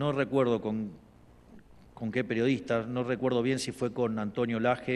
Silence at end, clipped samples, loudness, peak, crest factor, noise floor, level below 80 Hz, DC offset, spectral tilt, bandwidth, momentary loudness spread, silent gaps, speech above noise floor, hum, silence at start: 0 s; under 0.1%; -30 LUFS; -12 dBFS; 18 dB; -55 dBFS; -62 dBFS; under 0.1%; -6 dB/octave; 12.5 kHz; 7 LU; none; 26 dB; none; 0 s